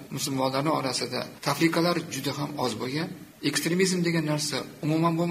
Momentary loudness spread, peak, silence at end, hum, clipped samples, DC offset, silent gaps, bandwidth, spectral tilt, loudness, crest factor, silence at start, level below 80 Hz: 7 LU; -10 dBFS; 0 s; none; under 0.1%; under 0.1%; none; 15.5 kHz; -4.5 dB/octave; -27 LUFS; 18 dB; 0 s; -66 dBFS